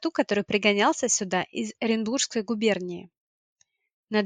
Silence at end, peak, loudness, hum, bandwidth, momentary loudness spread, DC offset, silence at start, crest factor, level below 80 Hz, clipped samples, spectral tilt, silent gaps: 0 s; -6 dBFS; -25 LUFS; none; 9.8 kHz; 8 LU; under 0.1%; 0 s; 20 dB; -72 dBFS; under 0.1%; -3 dB/octave; 3.18-3.56 s, 3.93-4.07 s